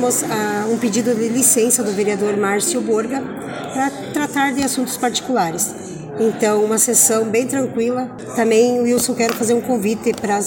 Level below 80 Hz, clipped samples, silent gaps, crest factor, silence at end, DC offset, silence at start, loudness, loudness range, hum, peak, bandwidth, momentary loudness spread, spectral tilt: -58 dBFS; under 0.1%; none; 16 dB; 0 s; under 0.1%; 0 s; -17 LUFS; 4 LU; none; 0 dBFS; 17 kHz; 9 LU; -3 dB/octave